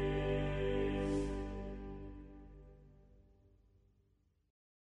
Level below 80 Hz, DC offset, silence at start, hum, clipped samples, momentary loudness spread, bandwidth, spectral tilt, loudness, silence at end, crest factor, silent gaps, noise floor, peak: -48 dBFS; under 0.1%; 0 s; none; under 0.1%; 20 LU; 10.5 kHz; -7.5 dB/octave; -39 LUFS; 2 s; 16 dB; none; -75 dBFS; -26 dBFS